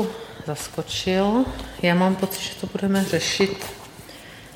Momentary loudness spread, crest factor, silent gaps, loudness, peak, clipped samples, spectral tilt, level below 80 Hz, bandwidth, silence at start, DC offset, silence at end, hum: 19 LU; 20 dB; none; -23 LUFS; -4 dBFS; under 0.1%; -4.5 dB/octave; -46 dBFS; 17.5 kHz; 0 s; under 0.1%; 0 s; none